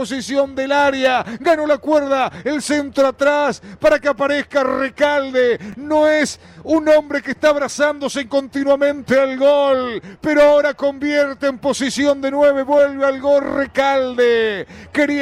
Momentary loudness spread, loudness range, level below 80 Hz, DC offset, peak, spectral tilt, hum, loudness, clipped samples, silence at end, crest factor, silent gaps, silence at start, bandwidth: 6 LU; 1 LU; -50 dBFS; under 0.1%; -6 dBFS; -4 dB/octave; none; -17 LUFS; under 0.1%; 0 s; 10 dB; none; 0 s; 13 kHz